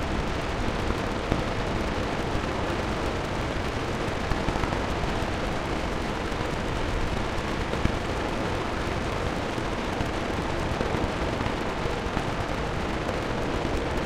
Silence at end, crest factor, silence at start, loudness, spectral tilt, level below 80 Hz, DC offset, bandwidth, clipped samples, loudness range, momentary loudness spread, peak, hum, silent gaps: 0 s; 22 dB; 0 s; -29 LUFS; -5.5 dB/octave; -34 dBFS; under 0.1%; 16 kHz; under 0.1%; 0 LU; 2 LU; -4 dBFS; none; none